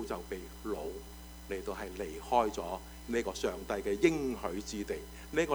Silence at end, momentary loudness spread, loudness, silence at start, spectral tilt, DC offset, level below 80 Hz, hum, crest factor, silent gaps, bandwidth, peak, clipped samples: 0 s; 13 LU; -36 LUFS; 0 s; -4.5 dB/octave; under 0.1%; -50 dBFS; none; 22 dB; none; over 20 kHz; -14 dBFS; under 0.1%